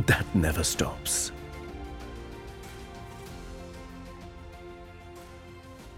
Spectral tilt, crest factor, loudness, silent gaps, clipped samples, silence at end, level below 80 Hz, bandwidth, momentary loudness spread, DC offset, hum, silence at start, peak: -4 dB/octave; 24 dB; -30 LUFS; none; under 0.1%; 0 s; -44 dBFS; 16.5 kHz; 20 LU; under 0.1%; none; 0 s; -8 dBFS